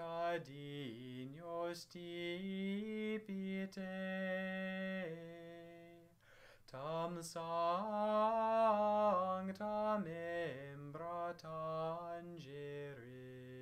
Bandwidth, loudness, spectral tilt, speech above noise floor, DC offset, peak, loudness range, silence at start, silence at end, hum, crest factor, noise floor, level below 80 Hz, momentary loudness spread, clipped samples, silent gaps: 15.5 kHz; -41 LUFS; -6 dB/octave; 24 dB; under 0.1%; -24 dBFS; 9 LU; 0 s; 0 s; none; 18 dB; -65 dBFS; -78 dBFS; 17 LU; under 0.1%; none